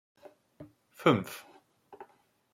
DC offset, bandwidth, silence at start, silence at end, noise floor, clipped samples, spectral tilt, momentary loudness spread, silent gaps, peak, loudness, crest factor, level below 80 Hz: under 0.1%; 16.5 kHz; 0.6 s; 0.5 s; -65 dBFS; under 0.1%; -6 dB/octave; 27 LU; none; -10 dBFS; -29 LUFS; 26 dB; -76 dBFS